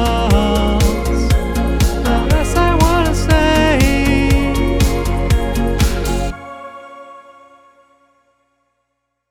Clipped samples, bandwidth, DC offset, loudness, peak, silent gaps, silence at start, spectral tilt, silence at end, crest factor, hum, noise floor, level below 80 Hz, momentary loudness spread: under 0.1%; 18.5 kHz; under 0.1%; -15 LUFS; 0 dBFS; none; 0 s; -5.5 dB/octave; 2.1 s; 14 dB; none; -71 dBFS; -18 dBFS; 13 LU